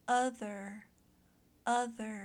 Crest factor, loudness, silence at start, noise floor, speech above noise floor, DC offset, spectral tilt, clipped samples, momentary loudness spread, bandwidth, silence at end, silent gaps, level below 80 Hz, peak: 18 dB; -36 LUFS; 0.05 s; -68 dBFS; 33 dB; under 0.1%; -3.5 dB/octave; under 0.1%; 15 LU; 14 kHz; 0 s; none; -76 dBFS; -20 dBFS